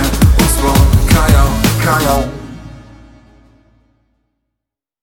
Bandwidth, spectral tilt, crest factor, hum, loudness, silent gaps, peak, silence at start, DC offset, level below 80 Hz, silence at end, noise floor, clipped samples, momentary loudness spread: 17.5 kHz; -5 dB/octave; 14 dB; none; -11 LUFS; none; 0 dBFS; 0 s; under 0.1%; -18 dBFS; 2.25 s; -80 dBFS; under 0.1%; 16 LU